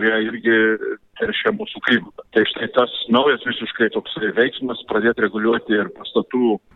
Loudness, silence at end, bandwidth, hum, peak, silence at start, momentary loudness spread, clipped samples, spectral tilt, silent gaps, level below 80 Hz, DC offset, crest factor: -19 LUFS; 0.2 s; 4.1 kHz; none; -4 dBFS; 0 s; 7 LU; under 0.1%; -7 dB/octave; none; -60 dBFS; under 0.1%; 16 dB